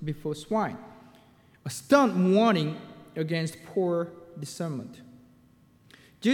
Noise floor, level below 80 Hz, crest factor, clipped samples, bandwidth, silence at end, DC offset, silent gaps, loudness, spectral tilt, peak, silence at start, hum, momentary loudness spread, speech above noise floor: -59 dBFS; -66 dBFS; 20 dB; under 0.1%; 18.5 kHz; 0 s; under 0.1%; none; -27 LUFS; -6 dB/octave; -8 dBFS; 0 s; none; 19 LU; 33 dB